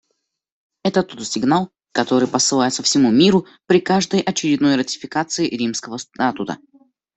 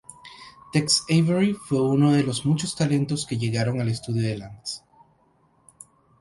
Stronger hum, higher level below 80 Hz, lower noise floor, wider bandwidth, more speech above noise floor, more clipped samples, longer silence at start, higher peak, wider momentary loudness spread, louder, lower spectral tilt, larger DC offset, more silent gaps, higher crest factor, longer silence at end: neither; about the same, -58 dBFS vs -56 dBFS; first, -73 dBFS vs -62 dBFS; second, 8.4 kHz vs 11.5 kHz; first, 55 dB vs 40 dB; neither; first, 0.85 s vs 0.1 s; first, -2 dBFS vs -6 dBFS; second, 10 LU vs 16 LU; first, -18 LUFS vs -23 LUFS; second, -4 dB/octave vs -5.5 dB/octave; neither; neither; about the same, 18 dB vs 18 dB; second, 0.6 s vs 1.4 s